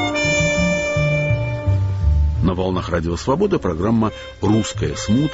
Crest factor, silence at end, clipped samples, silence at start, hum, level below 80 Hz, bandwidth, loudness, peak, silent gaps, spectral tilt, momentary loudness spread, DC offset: 12 dB; 0 s; under 0.1%; 0 s; none; -26 dBFS; 8 kHz; -19 LUFS; -6 dBFS; none; -6 dB/octave; 5 LU; under 0.1%